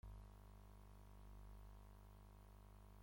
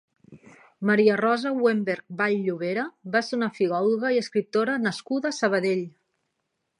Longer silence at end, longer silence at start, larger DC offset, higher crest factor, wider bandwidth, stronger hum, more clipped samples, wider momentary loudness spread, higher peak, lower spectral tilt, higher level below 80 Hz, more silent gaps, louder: second, 0 s vs 0.9 s; second, 0.05 s vs 0.3 s; neither; about the same, 14 dB vs 18 dB; first, 16.5 kHz vs 11 kHz; first, 50 Hz at -60 dBFS vs none; neither; second, 3 LU vs 8 LU; second, -46 dBFS vs -6 dBFS; about the same, -6.5 dB/octave vs -5.5 dB/octave; first, -62 dBFS vs -76 dBFS; neither; second, -64 LUFS vs -25 LUFS